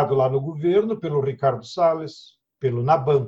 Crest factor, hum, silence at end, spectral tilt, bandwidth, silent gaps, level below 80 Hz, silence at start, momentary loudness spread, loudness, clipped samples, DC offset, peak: 16 dB; none; 0 s; -8 dB/octave; 7.8 kHz; none; -60 dBFS; 0 s; 7 LU; -22 LUFS; under 0.1%; under 0.1%; -4 dBFS